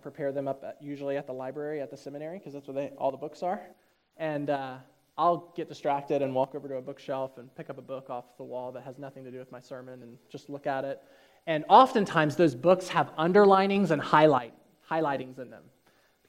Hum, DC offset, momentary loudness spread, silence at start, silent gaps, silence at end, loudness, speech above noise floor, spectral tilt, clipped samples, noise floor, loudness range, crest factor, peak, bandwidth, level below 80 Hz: none; under 0.1%; 22 LU; 0.05 s; none; 0.7 s; -27 LUFS; 37 dB; -6.5 dB/octave; under 0.1%; -66 dBFS; 16 LU; 24 dB; -6 dBFS; 15.5 kHz; -76 dBFS